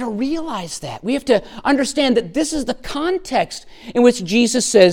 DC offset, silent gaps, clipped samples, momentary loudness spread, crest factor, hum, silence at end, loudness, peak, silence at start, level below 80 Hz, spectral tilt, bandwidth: under 0.1%; none; under 0.1%; 11 LU; 18 dB; none; 0 s; -18 LUFS; 0 dBFS; 0 s; -44 dBFS; -4 dB/octave; 16.5 kHz